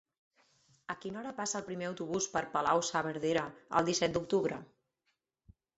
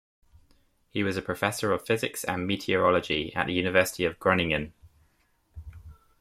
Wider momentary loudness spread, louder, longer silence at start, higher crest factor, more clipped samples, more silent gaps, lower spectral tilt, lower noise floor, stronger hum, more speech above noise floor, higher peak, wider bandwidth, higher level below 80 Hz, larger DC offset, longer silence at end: second, 11 LU vs 16 LU; second, -34 LUFS vs -27 LUFS; about the same, 0.9 s vs 0.95 s; about the same, 24 dB vs 22 dB; neither; neither; about the same, -3.5 dB/octave vs -4.5 dB/octave; first, -82 dBFS vs -68 dBFS; neither; first, 48 dB vs 41 dB; second, -12 dBFS vs -6 dBFS; second, 8 kHz vs 16 kHz; second, -68 dBFS vs -54 dBFS; neither; first, 1.1 s vs 0.25 s